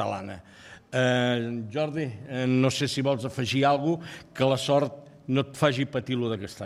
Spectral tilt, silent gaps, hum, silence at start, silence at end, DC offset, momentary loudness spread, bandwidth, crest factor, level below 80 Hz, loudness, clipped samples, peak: -5.5 dB/octave; none; none; 0 s; 0 s; under 0.1%; 10 LU; 14 kHz; 18 dB; -64 dBFS; -27 LUFS; under 0.1%; -8 dBFS